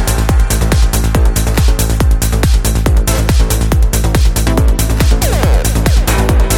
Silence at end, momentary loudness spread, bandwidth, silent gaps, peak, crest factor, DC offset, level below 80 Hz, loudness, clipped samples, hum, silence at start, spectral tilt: 0 s; 1 LU; 17 kHz; none; 0 dBFS; 10 dB; under 0.1%; -12 dBFS; -12 LUFS; under 0.1%; none; 0 s; -5 dB/octave